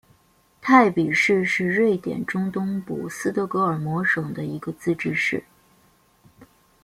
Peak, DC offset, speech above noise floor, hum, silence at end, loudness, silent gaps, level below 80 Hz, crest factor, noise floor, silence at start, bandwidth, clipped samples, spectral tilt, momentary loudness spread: -2 dBFS; under 0.1%; 38 dB; none; 0.4 s; -22 LUFS; none; -62 dBFS; 22 dB; -60 dBFS; 0.65 s; 15.5 kHz; under 0.1%; -6 dB/octave; 13 LU